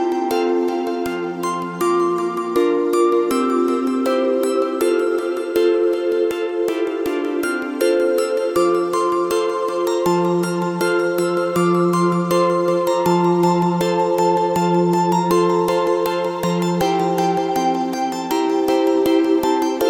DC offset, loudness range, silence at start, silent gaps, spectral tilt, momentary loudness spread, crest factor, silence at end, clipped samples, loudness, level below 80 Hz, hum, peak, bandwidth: under 0.1%; 2 LU; 0 s; none; -6 dB/octave; 5 LU; 14 dB; 0 s; under 0.1%; -18 LUFS; -56 dBFS; none; -4 dBFS; 17.5 kHz